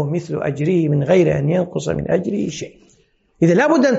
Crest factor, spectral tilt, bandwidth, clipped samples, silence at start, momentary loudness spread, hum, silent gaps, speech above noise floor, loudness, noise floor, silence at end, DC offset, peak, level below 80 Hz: 14 dB; -7 dB/octave; 8 kHz; under 0.1%; 0 s; 9 LU; none; none; 22 dB; -18 LUFS; -39 dBFS; 0 s; under 0.1%; -4 dBFS; -48 dBFS